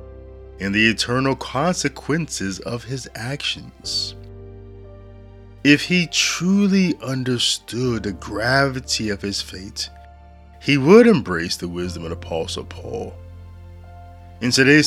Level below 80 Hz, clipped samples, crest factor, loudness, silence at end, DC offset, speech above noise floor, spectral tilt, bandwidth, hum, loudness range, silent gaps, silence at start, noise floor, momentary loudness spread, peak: -46 dBFS; under 0.1%; 20 dB; -20 LUFS; 0 s; under 0.1%; 24 dB; -4.5 dB/octave; 15 kHz; none; 8 LU; none; 0 s; -44 dBFS; 15 LU; 0 dBFS